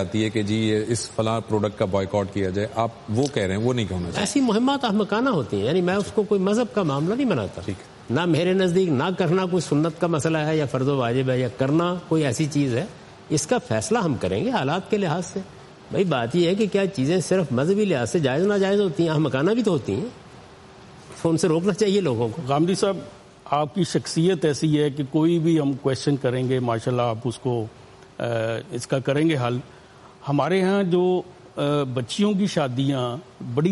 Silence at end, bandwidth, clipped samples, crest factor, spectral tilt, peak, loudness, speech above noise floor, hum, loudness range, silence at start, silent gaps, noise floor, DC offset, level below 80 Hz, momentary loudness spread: 0 s; 11.5 kHz; under 0.1%; 14 dB; -6 dB/octave; -8 dBFS; -23 LUFS; 24 dB; none; 3 LU; 0 s; none; -46 dBFS; under 0.1%; -58 dBFS; 7 LU